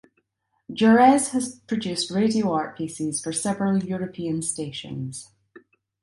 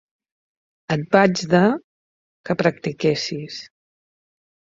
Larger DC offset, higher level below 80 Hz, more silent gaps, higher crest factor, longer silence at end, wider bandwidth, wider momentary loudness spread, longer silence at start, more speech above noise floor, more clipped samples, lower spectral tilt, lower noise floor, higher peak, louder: neither; about the same, -62 dBFS vs -60 dBFS; second, none vs 1.84-2.44 s; about the same, 20 dB vs 22 dB; second, 0.45 s vs 1.1 s; first, 11.5 kHz vs 7.8 kHz; first, 16 LU vs 13 LU; second, 0.7 s vs 0.9 s; second, 51 dB vs over 71 dB; neither; about the same, -4.5 dB/octave vs -5.5 dB/octave; second, -73 dBFS vs under -90 dBFS; about the same, -4 dBFS vs -2 dBFS; second, -23 LUFS vs -20 LUFS